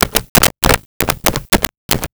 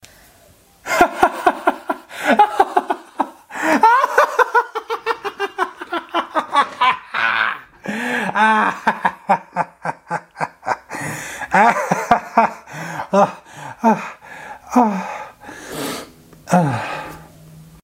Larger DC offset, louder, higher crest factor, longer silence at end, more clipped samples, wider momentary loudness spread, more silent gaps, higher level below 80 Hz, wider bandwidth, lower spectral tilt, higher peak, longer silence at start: neither; first, -14 LUFS vs -18 LUFS; about the same, 16 dB vs 20 dB; second, 0.05 s vs 0.2 s; neither; second, 7 LU vs 15 LU; first, 0.29-0.35 s, 0.86-1.00 s, 1.77-1.89 s vs none; first, -28 dBFS vs -54 dBFS; first, over 20 kHz vs 16 kHz; second, -2.5 dB/octave vs -4.5 dB/octave; about the same, 0 dBFS vs 0 dBFS; second, 0 s vs 0.85 s